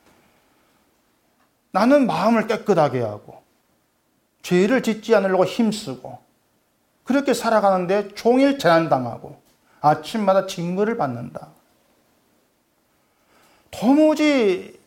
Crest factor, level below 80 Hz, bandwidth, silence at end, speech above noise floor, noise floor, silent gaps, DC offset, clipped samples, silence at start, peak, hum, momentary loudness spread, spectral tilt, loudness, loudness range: 16 dB; -64 dBFS; 16.5 kHz; 0.15 s; 47 dB; -66 dBFS; none; under 0.1%; under 0.1%; 1.75 s; -4 dBFS; none; 16 LU; -6 dB/octave; -19 LUFS; 5 LU